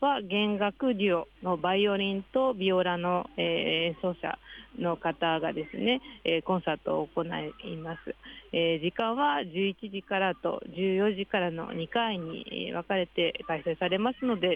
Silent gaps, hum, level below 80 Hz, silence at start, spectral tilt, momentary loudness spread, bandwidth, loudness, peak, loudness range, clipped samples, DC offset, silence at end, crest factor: none; none; -62 dBFS; 0 s; -8 dB/octave; 9 LU; 5 kHz; -30 LUFS; -14 dBFS; 3 LU; under 0.1%; under 0.1%; 0 s; 16 dB